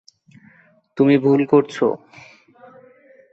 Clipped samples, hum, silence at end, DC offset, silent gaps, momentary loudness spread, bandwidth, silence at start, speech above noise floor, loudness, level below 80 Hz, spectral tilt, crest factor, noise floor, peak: under 0.1%; none; 1.35 s; under 0.1%; none; 15 LU; 7.8 kHz; 0.95 s; 37 dB; -17 LUFS; -66 dBFS; -8 dB/octave; 18 dB; -54 dBFS; -4 dBFS